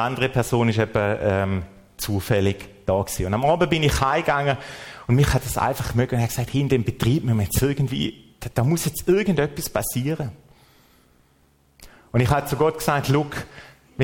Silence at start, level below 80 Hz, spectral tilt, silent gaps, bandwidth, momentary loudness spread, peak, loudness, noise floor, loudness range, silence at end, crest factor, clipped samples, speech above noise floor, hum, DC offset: 0 s; -40 dBFS; -5.5 dB/octave; none; 17 kHz; 10 LU; -6 dBFS; -22 LUFS; -60 dBFS; 4 LU; 0 s; 16 dB; under 0.1%; 38 dB; none; under 0.1%